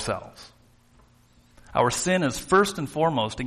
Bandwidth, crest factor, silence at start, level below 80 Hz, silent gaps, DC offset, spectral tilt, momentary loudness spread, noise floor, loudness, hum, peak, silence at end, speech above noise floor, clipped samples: 13.5 kHz; 18 dB; 0 s; -50 dBFS; none; under 0.1%; -4.5 dB/octave; 10 LU; -58 dBFS; -24 LUFS; none; -8 dBFS; 0 s; 34 dB; under 0.1%